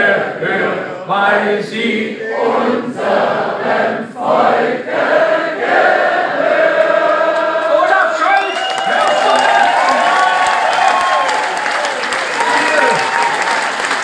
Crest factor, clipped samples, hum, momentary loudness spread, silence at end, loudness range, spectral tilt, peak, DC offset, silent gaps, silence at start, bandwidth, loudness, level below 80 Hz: 14 dB; under 0.1%; none; 5 LU; 0 s; 3 LU; -3 dB/octave; 0 dBFS; under 0.1%; none; 0 s; 10.5 kHz; -13 LUFS; -64 dBFS